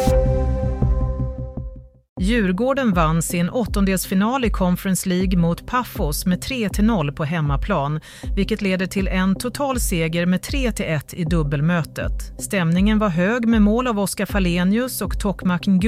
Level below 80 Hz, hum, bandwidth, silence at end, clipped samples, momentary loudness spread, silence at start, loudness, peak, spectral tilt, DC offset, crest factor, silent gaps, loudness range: -28 dBFS; none; 16 kHz; 0 s; under 0.1%; 7 LU; 0 s; -21 LUFS; -6 dBFS; -6 dB/octave; under 0.1%; 14 dB; 2.09-2.16 s; 2 LU